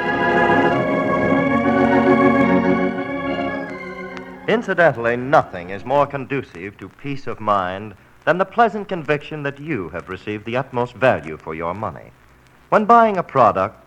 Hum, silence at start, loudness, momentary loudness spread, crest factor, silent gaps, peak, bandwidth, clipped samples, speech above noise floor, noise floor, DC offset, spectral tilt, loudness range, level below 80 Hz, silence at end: none; 0 s; -18 LUFS; 15 LU; 18 dB; none; 0 dBFS; 9.2 kHz; under 0.1%; 30 dB; -50 dBFS; under 0.1%; -7.5 dB/octave; 6 LU; -50 dBFS; 0.15 s